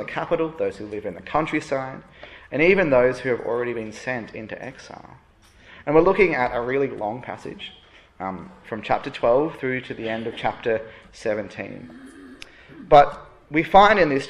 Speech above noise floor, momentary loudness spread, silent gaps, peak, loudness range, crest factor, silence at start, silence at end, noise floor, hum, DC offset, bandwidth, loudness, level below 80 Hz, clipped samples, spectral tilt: 28 dB; 24 LU; none; -2 dBFS; 4 LU; 22 dB; 0 s; 0 s; -50 dBFS; none; under 0.1%; 11 kHz; -21 LUFS; -50 dBFS; under 0.1%; -6 dB/octave